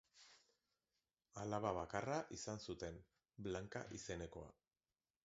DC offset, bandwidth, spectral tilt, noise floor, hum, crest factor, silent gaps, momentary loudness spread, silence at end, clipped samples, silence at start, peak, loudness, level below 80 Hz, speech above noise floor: under 0.1%; 7.6 kHz; -5 dB/octave; under -90 dBFS; none; 24 dB; none; 20 LU; 0.75 s; under 0.1%; 0.15 s; -26 dBFS; -48 LUFS; -68 dBFS; over 43 dB